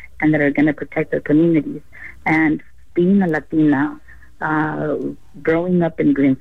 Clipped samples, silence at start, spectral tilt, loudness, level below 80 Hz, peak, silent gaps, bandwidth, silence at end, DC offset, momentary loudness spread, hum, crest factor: under 0.1%; 0.2 s; -9.5 dB/octave; -18 LUFS; -50 dBFS; -6 dBFS; none; 4.5 kHz; 0.05 s; 1%; 10 LU; none; 12 dB